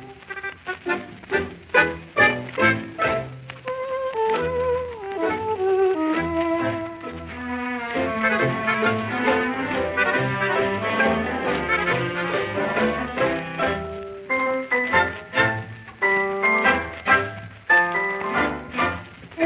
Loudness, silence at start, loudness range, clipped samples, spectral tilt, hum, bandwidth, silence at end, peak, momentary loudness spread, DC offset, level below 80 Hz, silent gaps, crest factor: -22 LUFS; 0 s; 4 LU; under 0.1%; -8.5 dB/octave; none; 4 kHz; 0 s; -4 dBFS; 12 LU; under 0.1%; -48 dBFS; none; 20 dB